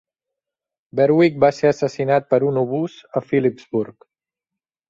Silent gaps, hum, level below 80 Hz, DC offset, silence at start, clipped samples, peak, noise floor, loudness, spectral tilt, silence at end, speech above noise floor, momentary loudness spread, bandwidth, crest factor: none; none; -62 dBFS; under 0.1%; 0.95 s; under 0.1%; -2 dBFS; -87 dBFS; -19 LUFS; -7.5 dB/octave; 1 s; 68 dB; 10 LU; 7.6 kHz; 18 dB